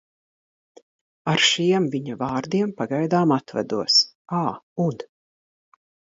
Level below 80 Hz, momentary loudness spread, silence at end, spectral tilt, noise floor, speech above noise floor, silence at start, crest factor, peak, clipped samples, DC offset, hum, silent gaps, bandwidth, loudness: -66 dBFS; 10 LU; 1.1 s; -4 dB/octave; under -90 dBFS; over 68 dB; 1.25 s; 18 dB; -6 dBFS; under 0.1%; under 0.1%; none; 4.15-4.25 s, 4.63-4.76 s; 7.8 kHz; -22 LUFS